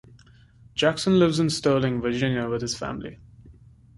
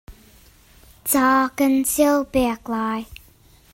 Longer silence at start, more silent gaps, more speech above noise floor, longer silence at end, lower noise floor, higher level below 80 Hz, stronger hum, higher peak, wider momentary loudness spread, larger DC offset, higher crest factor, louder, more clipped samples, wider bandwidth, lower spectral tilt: first, 0.75 s vs 0.1 s; neither; about the same, 30 dB vs 33 dB; second, 0.45 s vs 0.6 s; about the same, -53 dBFS vs -52 dBFS; about the same, -52 dBFS vs -48 dBFS; neither; about the same, -8 dBFS vs -6 dBFS; about the same, 13 LU vs 12 LU; neither; about the same, 18 dB vs 16 dB; second, -24 LUFS vs -20 LUFS; neither; second, 11.5 kHz vs 16.5 kHz; first, -5.5 dB/octave vs -3.5 dB/octave